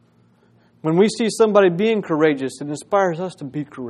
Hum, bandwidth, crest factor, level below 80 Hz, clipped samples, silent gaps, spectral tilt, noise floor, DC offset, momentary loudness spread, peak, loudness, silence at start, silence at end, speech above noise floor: none; 12.5 kHz; 20 dB; -66 dBFS; under 0.1%; none; -5.5 dB/octave; -56 dBFS; under 0.1%; 13 LU; 0 dBFS; -19 LUFS; 0.85 s; 0 s; 38 dB